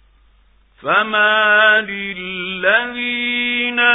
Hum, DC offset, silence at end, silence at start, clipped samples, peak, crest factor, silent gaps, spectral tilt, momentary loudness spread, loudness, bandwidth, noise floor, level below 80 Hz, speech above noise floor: none; under 0.1%; 0 s; 0.85 s; under 0.1%; 0 dBFS; 16 dB; none; -8 dB/octave; 13 LU; -15 LUFS; 4 kHz; -53 dBFS; -56 dBFS; 37 dB